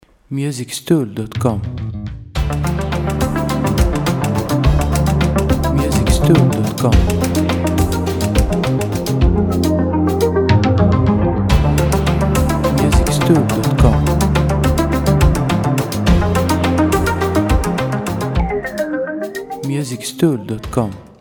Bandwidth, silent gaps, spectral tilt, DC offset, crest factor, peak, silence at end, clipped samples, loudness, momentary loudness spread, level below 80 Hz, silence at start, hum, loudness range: over 20 kHz; none; -6.5 dB/octave; under 0.1%; 14 dB; 0 dBFS; 0.15 s; under 0.1%; -16 LUFS; 8 LU; -22 dBFS; 0.3 s; none; 5 LU